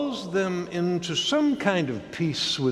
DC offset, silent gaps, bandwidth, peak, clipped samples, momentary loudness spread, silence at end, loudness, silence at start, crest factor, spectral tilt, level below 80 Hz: under 0.1%; none; 12.5 kHz; -6 dBFS; under 0.1%; 5 LU; 0 s; -25 LUFS; 0 s; 20 dB; -4.5 dB/octave; -60 dBFS